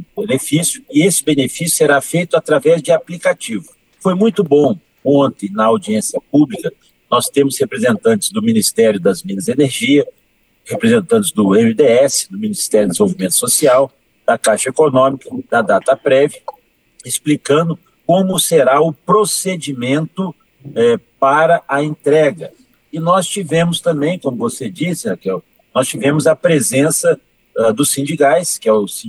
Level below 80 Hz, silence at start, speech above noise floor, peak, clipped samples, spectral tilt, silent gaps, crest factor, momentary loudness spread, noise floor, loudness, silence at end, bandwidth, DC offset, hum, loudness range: -58 dBFS; 0 s; 35 dB; -2 dBFS; under 0.1%; -4.5 dB/octave; none; 14 dB; 9 LU; -49 dBFS; -14 LUFS; 0 s; 13 kHz; under 0.1%; none; 3 LU